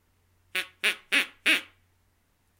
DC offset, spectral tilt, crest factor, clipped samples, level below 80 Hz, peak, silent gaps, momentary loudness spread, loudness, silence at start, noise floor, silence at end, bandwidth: under 0.1%; 0.5 dB/octave; 24 dB; under 0.1%; -74 dBFS; -6 dBFS; none; 9 LU; -26 LUFS; 0.55 s; -69 dBFS; 0.95 s; 17 kHz